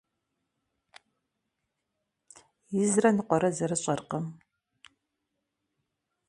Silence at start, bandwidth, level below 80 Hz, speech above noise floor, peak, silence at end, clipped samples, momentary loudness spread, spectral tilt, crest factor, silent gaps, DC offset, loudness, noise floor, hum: 2.7 s; 11.5 kHz; -72 dBFS; 56 dB; -10 dBFS; 1.95 s; under 0.1%; 12 LU; -5.5 dB/octave; 22 dB; none; under 0.1%; -28 LUFS; -83 dBFS; none